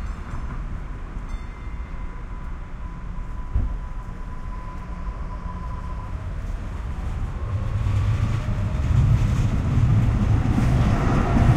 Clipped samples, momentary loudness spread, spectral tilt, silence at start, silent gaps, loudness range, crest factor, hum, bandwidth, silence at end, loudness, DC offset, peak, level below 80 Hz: under 0.1%; 16 LU; -8 dB/octave; 0 s; none; 12 LU; 18 dB; none; 9.6 kHz; 0 s; -25 LUFS; under 0.1%; -6 dBFS; -28 dBFS